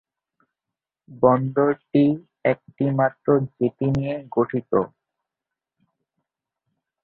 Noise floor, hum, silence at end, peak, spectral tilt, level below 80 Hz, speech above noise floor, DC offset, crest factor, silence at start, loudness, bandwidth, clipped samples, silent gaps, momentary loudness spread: -87 dBFS; none; 2.15 s; -2 dBFS; -10 dB/octave; -58 dBFS; 66 dB; under 0.1%; 20 dB; 1.1 s; -22 LUFS; 4.8 kHz; under 0.1%; none; 6 LU